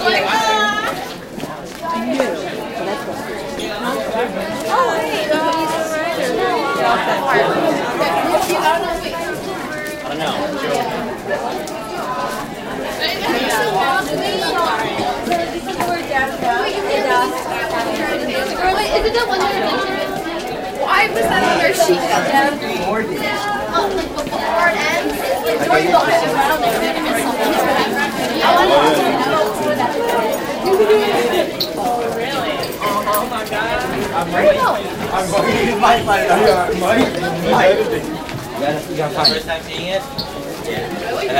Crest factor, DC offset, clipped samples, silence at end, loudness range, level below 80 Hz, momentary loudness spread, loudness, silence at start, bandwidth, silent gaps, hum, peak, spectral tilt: 16 dB; under 0.1%; under 0.1%; 0 s; 5 LU; -42 dBFS; 10 LU; -17 LUFS; 0 s; 17 kHz; none; none; -2 dBFS; -3.5 dB/octave